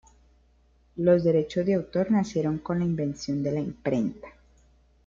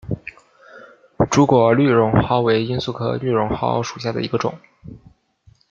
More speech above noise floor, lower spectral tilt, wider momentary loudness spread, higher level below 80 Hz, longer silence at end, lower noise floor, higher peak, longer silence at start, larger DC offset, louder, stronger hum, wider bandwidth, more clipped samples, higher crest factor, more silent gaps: about the same, 36 dB vs 37 dB; first, -8 dB/octave vs -6.5 dB/octave; second, 8 LU vs 11 LU; second, -56 dBFS vs -46 dBFS; about the same, 0.75 s vs 0.75 s; first, -62 dBFS vs -54 dBFS; second, -10 dBFS vs -2 dBFS; first, 0.95 s vs 0.05 s; neither; second, -26 LUFS vs -18 LUFS; neither; about the same, 7.6 kHz vs 7.6 kHz; neither; about the same, 18 dB vs 18 dB; neither